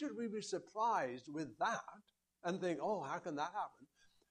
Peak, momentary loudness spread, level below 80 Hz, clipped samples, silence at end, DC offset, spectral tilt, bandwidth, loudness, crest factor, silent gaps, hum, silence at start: -26 dBFS; 9 LU; -86 dBFS; under 0.1%; 0.45 s; under 0.1%; -4.5 dB/octave; 10.5 kHz; -42 LUFS; 16 dB; none; none; 0 s